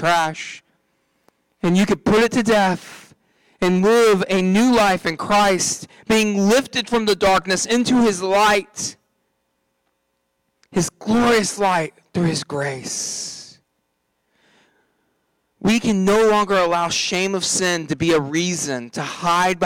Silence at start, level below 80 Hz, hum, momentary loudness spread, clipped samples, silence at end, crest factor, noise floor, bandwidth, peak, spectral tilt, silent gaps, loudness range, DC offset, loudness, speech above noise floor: 0 s; -50 dBFS; none; 11 LU; under 0.1%; 0 s; 12 dB; -71 dBFS; 18 kHz; -8 dBFS; -4 dB/octave; none; 7 LU; under 0.1%; -18 LUFS; 53 dB